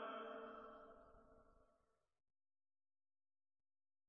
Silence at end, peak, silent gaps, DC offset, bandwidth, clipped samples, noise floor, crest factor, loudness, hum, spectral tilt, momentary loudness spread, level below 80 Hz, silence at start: 2.3 s; -40 dBFS; none; under 0.1%; 5.8 kHz; under 0.1%; -84 dBFS; 20 dB; -55 LUFS; none; -2 dB/octave; 16 LU; -80 dBFS; 0 s